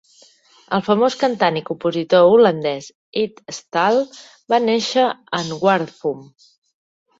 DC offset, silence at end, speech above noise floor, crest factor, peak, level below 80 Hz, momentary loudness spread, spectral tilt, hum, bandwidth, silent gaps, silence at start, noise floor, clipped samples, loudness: under 0.1%; 0.95 s; 34 dB; 16 dB; -2 dBFS; -64 dBFS; 13 LU; -5 dB/octave; none; 8 kHz; 2.95-3.12 s; 0.7 s; -52 dBFS; under 0.1%; -18 LUFS